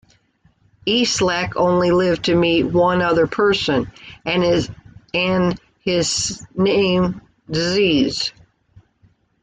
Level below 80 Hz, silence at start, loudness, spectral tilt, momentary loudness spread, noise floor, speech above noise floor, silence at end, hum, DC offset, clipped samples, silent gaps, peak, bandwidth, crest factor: -46 dBFS; 0.85 s; -18 LUFS; -4.5 dB/octave; 9 LU; -59 dBFS; 41 dB; 1.1 s; none; under 0.1%; under 0.1%; none; -6 dBFS; 9.4 kHz; 14 dB